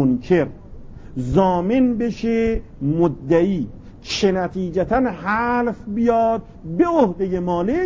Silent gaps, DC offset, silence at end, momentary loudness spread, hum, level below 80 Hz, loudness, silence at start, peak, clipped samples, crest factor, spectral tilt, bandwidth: none; under 0.1%; 0 s; 9 LU; none; -38 dBFS; -20 LUFS; 0 s; -4 dBFS; under 0.1%; 16 dB; -7 dB/octave; 7.6 kHz